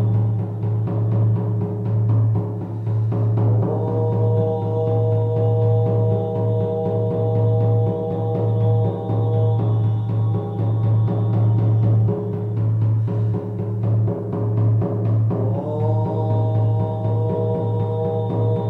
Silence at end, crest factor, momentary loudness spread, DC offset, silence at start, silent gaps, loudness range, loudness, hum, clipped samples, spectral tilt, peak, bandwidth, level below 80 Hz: 0 s; 10 dB; 4 LU; under 0.1%; 0 s; none; 2 LU; -20 LUFS; none; under 0.1%; -12 dB/octave; -8 dBFS; 3.8 kHz; -48 dBFS